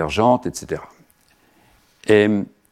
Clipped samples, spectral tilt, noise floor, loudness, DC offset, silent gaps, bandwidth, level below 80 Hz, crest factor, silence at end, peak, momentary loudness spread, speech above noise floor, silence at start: under 0.1%; -5.5 dB/octave; -58 dBFS; -19 LUFS; under 0.1%; none; 13.5 kHz; -48 dBFS; 18 dB; 0.25 s; -2 dBFS; 15 LU; 40 dB; 0 s